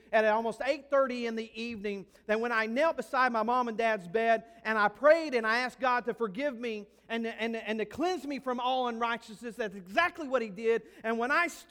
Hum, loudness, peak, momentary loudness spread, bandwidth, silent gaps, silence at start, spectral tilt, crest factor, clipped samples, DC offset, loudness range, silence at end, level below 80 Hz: none; -30 LUFS; -10 dBFS; 11 LU; 16.5 kHz; none; 0.1 s; -4.5 dB/octave; 20 dB; under 0.1%; under 0.1%; 5 LU; 0.1 s; -68 dBFS